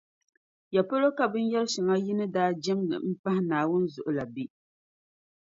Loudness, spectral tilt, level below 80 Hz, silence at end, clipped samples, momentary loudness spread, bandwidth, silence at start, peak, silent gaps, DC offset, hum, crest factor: -28 LUFS; -6 dB/octave; -72 dBFS; 0.95 s; under 0.1%; 7 LU; 7.8 kHz; 0.7 s; -10 dBFS; 3.19-3.24 s; under 0.1%; none; 18 dB